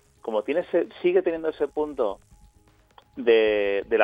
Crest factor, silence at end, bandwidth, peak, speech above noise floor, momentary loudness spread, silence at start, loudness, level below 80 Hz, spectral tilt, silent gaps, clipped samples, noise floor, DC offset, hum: 20 dB; 0 s; 5.2 kHz; -4 dBFS; 35 dB; 9 LU; 0.25 s; -24 LUFS; -58 dBFS; -6 dB/octave; none; under 0.1%; -59 dBFS; under 0.1%; none